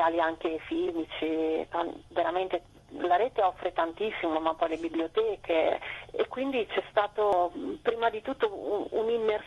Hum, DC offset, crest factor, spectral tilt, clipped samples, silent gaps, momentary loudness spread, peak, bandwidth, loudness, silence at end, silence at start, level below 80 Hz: none; under 0.1%; 18 dB; -5.5 dB/octave; under 0.1%; none; 7 LU; -12 dBFS; 12 kHz; -30 LUFS; 0 s; 0 s; -60 dBFS